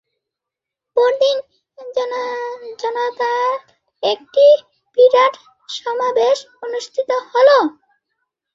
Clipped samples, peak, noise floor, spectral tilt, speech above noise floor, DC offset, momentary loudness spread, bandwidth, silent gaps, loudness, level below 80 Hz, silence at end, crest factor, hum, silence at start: under 0.1%; -2 dBFS; -84 dBFS; -2 dB/octave; 68 dB; under 0.1%; 14 LU; 7.6 kHz; none; -17 LUFS; -72 dBFS; 0.85 s; 16 dB; none; 0.95 s